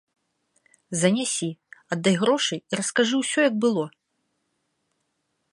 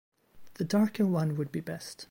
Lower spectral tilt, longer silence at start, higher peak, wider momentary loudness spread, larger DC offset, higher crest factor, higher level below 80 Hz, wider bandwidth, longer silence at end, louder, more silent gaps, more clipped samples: second, -4 dB/octave vs -7 dB/octave; first, 0.9 s vs 0.35 s; first, -6 dBFS vs -18 dBFS; about the same, 11 LU vs 12 LU; neither; first, 20 dB vs 14 dB; about the same, -72 dBFS vs -70 dBFS; second, 11.5 kHz vs 16.5 kHz; first, 1.65 s vs 0.05 s; first, -23 LUFS vs -30 LUFS; neither; neither